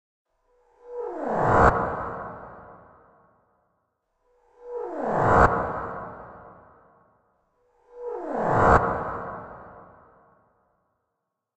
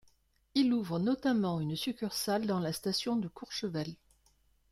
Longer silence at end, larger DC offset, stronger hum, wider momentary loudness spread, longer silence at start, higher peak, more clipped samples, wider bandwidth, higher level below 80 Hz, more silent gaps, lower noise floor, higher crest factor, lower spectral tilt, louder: first, 1.75 s vs 0.8 s; neither; neither; first, 24 LU vs 8 LU; first, 0.85 s vs 0.55 s; first, -2 dBFS vs -16 dBFS; neither; second, 9 kHz vs 16 kHz; first, -42 dBFS vs -68 dBFS; neither; first, -81 dBFS vs -70 dBFS; first, 24 dB vs 18 dB; first, -8 dB/octave vs -5.5 dB/octave; first, -23 LUFS vs -33 LUFS